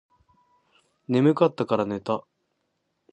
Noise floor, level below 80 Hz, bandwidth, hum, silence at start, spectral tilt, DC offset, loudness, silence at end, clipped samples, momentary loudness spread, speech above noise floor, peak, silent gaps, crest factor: -76 dBFS; -68 dBFS; 8.6 kHz; none; 1.1 s; -8.5 dB/octave; under 0.1%; -24 LUFS; 0.9 s; under 0.1%; 10 LU; 53 dB; -4 dBFS; none; 22 dB